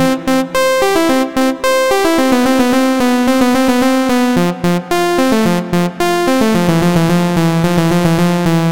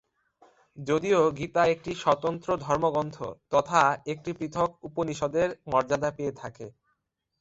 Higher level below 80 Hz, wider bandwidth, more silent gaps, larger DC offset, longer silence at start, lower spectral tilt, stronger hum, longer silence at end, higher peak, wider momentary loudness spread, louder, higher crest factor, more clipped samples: first, -38 dBFS vs -58 dBFS; first, 17 kHz vs 8 kHz; neither; first, 3% vs under 0.1%; second, 0 s vs 0.75 s; about the same, -5.5 dB/octave vs -5.5 dB/octave; neither; second, 0 s vs 0.7 s; first, -2 dBFS vs -6 dBFS; second, 3 LU vs 12 LU; first, -12 LUFS vs -27 LUFS; second, 10 dB vs 22 dB; neither